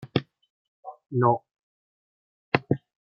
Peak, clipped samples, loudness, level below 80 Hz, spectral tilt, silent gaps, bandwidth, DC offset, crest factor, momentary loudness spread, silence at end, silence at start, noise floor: -2 dBFS; under 0.1%; -27 LUFS; -66 dBFS; -9 dB/octave; 0.50-0.83 s, 1.63-2.52 s; 5.8 kHz; under 0.1%; 26 dB; 22 LU; 0.35 s; 0 s; under -90 dBFS